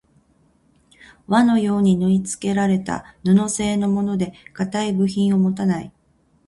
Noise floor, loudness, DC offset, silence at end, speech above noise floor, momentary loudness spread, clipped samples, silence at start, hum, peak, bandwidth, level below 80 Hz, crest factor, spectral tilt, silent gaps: -60 dBFS; -20 LUFS; under 0.1%; 0.6 s; 41 dB; 9 LU; under 0.1%; 1.3 s; none; -4 dBFS; 11.5 kHz; -52 dBFS; 16 dB; -6 dB/octave; none